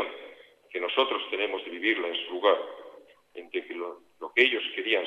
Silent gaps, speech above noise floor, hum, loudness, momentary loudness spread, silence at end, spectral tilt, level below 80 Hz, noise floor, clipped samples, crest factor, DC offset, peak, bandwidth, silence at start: none; 24 dB; none; -28 LUFS; 21 LU; 0 s; -3 dB/octave; -82 dBFS; -52 dBFS; under 0.1%; 24 dB; under 0.1%; -6 dBFS; 8.2 kHz; 0 s